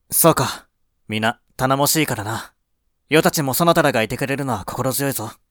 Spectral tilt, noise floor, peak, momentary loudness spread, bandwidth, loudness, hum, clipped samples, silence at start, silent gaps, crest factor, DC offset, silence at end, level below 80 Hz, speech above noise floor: -4 dB/octave; -69 dBFS; 0 dBFS; 11 LU; over 20 kHz; -19 LUFS; none; under 0.1%; 0.1 s; none; 20 dB; under 0.1%; 0.2 s; -50 dBFS; 50 dB